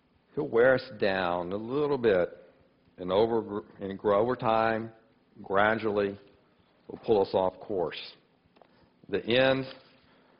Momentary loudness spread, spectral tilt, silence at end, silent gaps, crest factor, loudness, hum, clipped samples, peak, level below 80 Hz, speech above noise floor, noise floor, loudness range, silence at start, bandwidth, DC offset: 15 LU; -9 dB/octave; 0.6 s; none; 20 dB; -28 LUFS; none; under 0.1%; -10 dBFS; -62 dBFS; 37 dB; -64 dBFS; 3 LU; 0.35 s; 5.4 kHz; under 0.1%